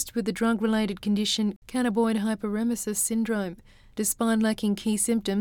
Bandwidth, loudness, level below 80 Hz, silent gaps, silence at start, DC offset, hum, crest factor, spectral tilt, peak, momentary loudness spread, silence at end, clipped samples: 19 kHz; -26 LUFS; -54 dBFS; 1.56-1.62 s; 0 s; under 0.1%; none; 14 dB; -4 dB/octave; -12 dBFS; 5 LU; 0 s; under 0.1%